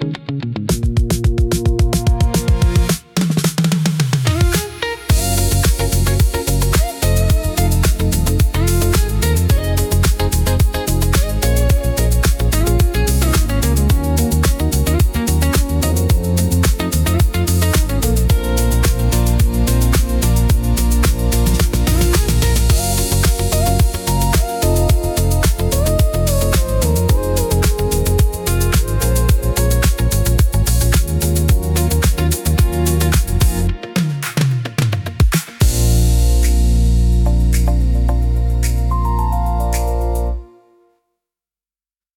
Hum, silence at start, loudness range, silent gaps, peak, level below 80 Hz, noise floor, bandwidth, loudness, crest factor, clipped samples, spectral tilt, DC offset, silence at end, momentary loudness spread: none; 0 s; 1 LU; none; -2 dBFS; -18 dBFS; under -90 dBFS; 18 kHz; -16 LUFS; 12 dB; under 0.1%; -5 dB/octave; under 0.1%; 1.7 s; 3 LU